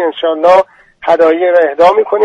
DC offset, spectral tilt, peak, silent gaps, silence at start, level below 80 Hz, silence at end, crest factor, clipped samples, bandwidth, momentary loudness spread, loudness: under 0.1%; -5 dB/octave; 0 dBFS; none; 0 s; -52 dBFS; 0 s; 10 dB; 0.2%; 8 kHz; 7 LU; -9 LUFS